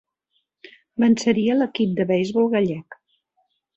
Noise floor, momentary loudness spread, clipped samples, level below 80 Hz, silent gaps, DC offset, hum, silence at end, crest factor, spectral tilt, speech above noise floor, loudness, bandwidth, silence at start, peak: -72 dBFS; 7 LU; under 0.1%; -64 dBFS; none; under 0.1%; none; 0.85 s; 16 dB; -6 dB/octave; 53 dB; -20 LUFS; 8.2 kHz; 1 s; -6 dBFS